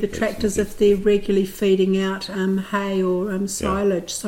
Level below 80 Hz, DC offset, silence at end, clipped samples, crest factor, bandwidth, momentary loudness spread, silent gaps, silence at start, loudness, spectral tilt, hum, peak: -42 dBFS; under 0.1%; 0 s; under 0.1%; 14 dB; 16.5 kHz; 6 LU; none; 0 s; -21 LUFS; -5.5 dB/octave; none; -6 dBFS